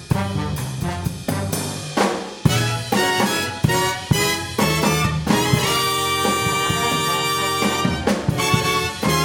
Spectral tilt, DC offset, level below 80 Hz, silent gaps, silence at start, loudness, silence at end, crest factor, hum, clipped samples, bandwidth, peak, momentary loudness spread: -4 dB/octave; under 0.1%; -40 dBFS; none; 0 s; -20 LUFS; 0 s; 18 dB; none; under 0.1%; 18 kHz; -2 dBFS; 7 LU